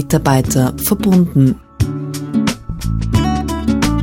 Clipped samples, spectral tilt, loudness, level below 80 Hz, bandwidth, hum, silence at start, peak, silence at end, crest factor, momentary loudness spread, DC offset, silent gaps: under 0.1%; -6 dB/octave; -16 LUFS; -28 dBFS; 18 kHz; none; 0 s; 0 dBFS; 0 s; 14 dB; 8 LU; under 0.1%; none